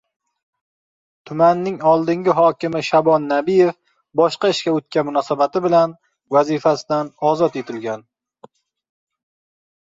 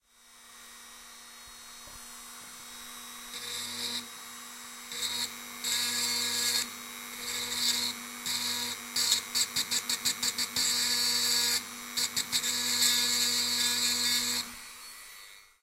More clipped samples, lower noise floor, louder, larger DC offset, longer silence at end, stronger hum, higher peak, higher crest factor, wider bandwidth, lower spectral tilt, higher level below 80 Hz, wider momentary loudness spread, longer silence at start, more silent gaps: neither; second, -49 dBFS vs -57 dBFS; first, -18 LUFS vs -28 LUFS; neither; first, 2 s vs 0.2 s; neither; first, -2 dBFS vs -8 dBFS; second, 16 dB vs 24 dB; second, 7.8 kHz vs 16 kHz; first, -6 dB/octave vs 1 dB/octave; first, -64 dBFS vs -70 dBFS; second, 8 LU vs 20 LU; first, 1.25 s vs 0.25 s; neither